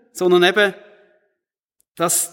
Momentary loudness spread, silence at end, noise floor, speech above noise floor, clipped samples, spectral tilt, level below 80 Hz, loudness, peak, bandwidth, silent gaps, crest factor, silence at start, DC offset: 7 LU; 0.05 s; -78 dBFS; 62 dB; under 0.1%; -3 dB/octave; -74 dBFS; -16 LUFS; -2 dBFS; 17 kHz; 1.65-1.69 s, 1.91-1.95 s; 18 dB; 0.15 s; under 0.1%